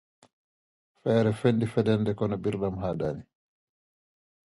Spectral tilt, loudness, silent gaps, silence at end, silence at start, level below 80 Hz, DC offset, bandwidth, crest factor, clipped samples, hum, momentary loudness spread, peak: -8 dB/octave; -27 LUFS; none; 1.3 s; 1.05 s; -56 dBFS; under 0.1%; 11.5 kHz; 20 dB; under 0.1%; none; 8 LU; -10 dBFS